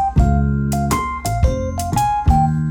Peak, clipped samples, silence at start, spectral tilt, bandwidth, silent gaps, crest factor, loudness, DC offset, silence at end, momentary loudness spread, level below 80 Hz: -4 dBFS; under 0.1%; 0 s; -6.5 dB/octave; 18.5 kHz; none; 12 dB; -18 LUFS; under 0.1%; 0 s; 5 LU; -22 dBFS